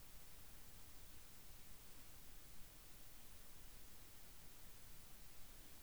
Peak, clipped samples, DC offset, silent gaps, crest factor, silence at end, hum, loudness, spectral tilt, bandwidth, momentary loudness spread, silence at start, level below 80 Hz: -42 dBFS; under 0.1%; 0.1%; none; 14 dB; 0 s; none; -59 LUFS; -2.5 dB/octave; over 20 kHz; 0 LU; 0 s; -64 dBFS